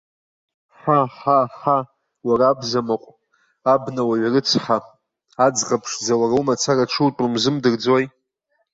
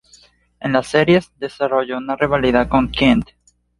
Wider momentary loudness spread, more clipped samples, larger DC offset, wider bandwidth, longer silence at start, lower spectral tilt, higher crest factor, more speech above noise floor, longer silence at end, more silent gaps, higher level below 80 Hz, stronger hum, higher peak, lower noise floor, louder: second, 6 LU vs 9 LU; neither; neither; second, 8 kHz vs 11.5 kHz; first, 0.85 s vs 0.6 s; second, -4.5 dB/octave vs -6.5 dB/octave; about the same, 16 dB vs 16 dB; first, 52 dB vs 35 dB; about the same, 0.65 s vs 0.55 s; neither; second, -60 dBFS vs -38 dBFS; neither; about the same, -4 dBFS vs -2 dBFS; first, -70 dBFS vs -51 dBFS; about the same, -19 LUFS vs -17 LUFS